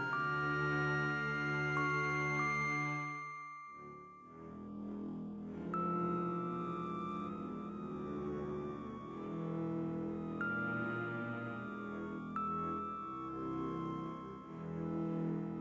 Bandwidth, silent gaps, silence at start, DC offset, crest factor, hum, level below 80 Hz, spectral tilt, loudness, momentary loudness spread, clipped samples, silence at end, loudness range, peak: 8 kHz; none; 0 s; under 0.1%; 16 dB; none; -64 dBFS; -7 dB/octave; -39 LUFS; 12 LU; under 0.1%; 0 s; 6 LU; -24 dBFS